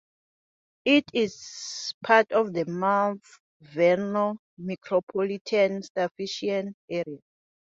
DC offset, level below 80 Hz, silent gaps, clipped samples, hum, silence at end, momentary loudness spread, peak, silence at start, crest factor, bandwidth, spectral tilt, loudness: under 0.1%; -72 dBFS; 1.94-2.01 s, 3.40-3.60 s, 4.39-4.57 s, 5.03-5.07 s, 5.41-5.45 s, 5.90-5.95 s, 6.11-6.15 s, 6.74-6.88 s; under 0.1%; none; 0.5 s; 14 LU; -4 dBFS; 0.85 s; 22 dB; 7.8 kHz; -4.5 dB/octave; -26 LUFS